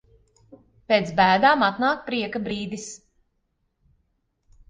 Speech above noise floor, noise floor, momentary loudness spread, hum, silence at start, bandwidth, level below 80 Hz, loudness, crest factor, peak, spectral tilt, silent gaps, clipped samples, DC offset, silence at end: 51 dB; -73 dBFS; 17 LU; none; 0.5 s; 9.6 kHz; -58 dBFS; -21 LUFS; 20 dB; -6 dBFS; -4.5 dB/octave; none; under 0.1%; under 0.1%; 1.75 s